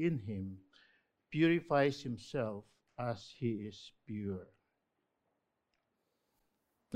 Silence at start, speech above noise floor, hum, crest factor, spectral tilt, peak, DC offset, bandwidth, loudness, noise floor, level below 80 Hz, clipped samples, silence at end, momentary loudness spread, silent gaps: 0 s; 48 dB; none; 22 dB; -7 dB/octave; -18 dBFS; under 0.1%; 9.4 kHz; -37 LUFS; -84 dBFS; -74 dBFS; under 0.1%; 0 s; 17 LU; none